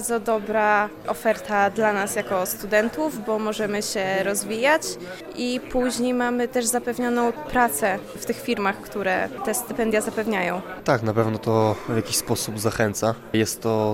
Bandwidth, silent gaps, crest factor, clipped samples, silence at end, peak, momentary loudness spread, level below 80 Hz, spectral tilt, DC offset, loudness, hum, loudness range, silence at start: 16.5 kHz; none; 18 dB; under 0.1%; 0 s; -6 dBFS; 6 LU; -52 dBFS; -4 dB/octave; under 0.1%; -23 LUFS; none; 1 LU; 0 s